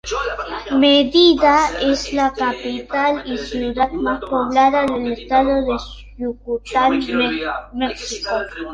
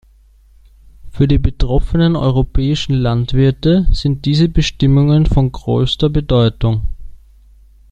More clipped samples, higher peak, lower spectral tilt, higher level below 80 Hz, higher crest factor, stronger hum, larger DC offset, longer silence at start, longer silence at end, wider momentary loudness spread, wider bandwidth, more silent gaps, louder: neither; about the same, -2 dBFS vs -2 dBFS; second, -3.5 dB/octave vs -7.5 dB/octave; second, -40 dBFS vs -22 dBFS; about the same, 16 dB vs 12 dB; neither; neither; second, 0.05 s vs 1.05 s; second, 0 s vs 0.75 s; first, 13 LU vs 5 LU; about the same, 9.2 kHz vs 8.6 kHz; neither; second, -18 LUFS vs -15 LUFS